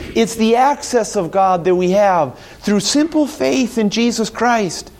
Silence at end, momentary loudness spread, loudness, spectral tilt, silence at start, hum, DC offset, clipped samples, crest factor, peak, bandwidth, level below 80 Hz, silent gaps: 0.1 s; 5 LU; -16 LUFS; -4.5 dB/octave; 0 s; none; under 0.1%; under 0.1%; 12 dB; -2 dBFS; 16 kHz; -46 dBFS; none